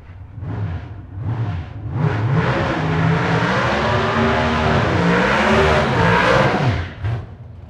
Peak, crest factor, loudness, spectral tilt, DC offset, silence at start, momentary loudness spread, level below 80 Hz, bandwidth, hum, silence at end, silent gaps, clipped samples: 0 dBFS; 18 dB; -17 LUFS; -6.5 dB/octave; under 0.1%; 0 s; 14 LU; -34 dBFS; 10.5 kHz; none; 0 s; none; under 0.1%